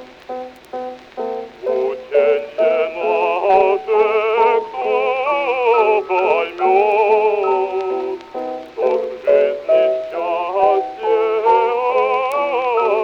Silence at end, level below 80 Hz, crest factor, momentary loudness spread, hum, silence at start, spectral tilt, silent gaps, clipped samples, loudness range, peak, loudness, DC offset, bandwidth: 0 s; -60 dBFS; 16 dB; 12 LU; none; 0 s; -4.5 dB/octave; none; under 0.1%; 3 LU; 0 dBFS; -17 LUFS; under 0.1%; 7 kHz